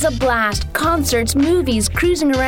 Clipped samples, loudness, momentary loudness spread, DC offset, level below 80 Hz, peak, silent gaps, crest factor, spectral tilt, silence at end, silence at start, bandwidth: under 0.1%; -16 LUFS; 2 LU; under 0.1%; -28 dBFS; -4 dBFS; none; 12 dB; -4.5 dB/octave; 0 s; 0 s; 17.5 kHz